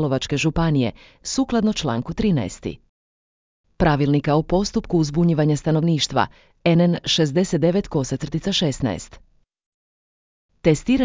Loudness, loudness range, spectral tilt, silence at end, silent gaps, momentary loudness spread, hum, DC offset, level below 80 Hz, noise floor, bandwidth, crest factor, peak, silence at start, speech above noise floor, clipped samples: -21 LUFS; 5 LU; -6 dB/octave; 0 s; 2.89-3.64 s, 9.66-10.49 s; 8 LU; none; under 0.1%; -40 dBFS; under -90 dBFS; 7.6 kHz; 18 dB; -4 dBFS; 0 s; over 70 dB; under 0.1%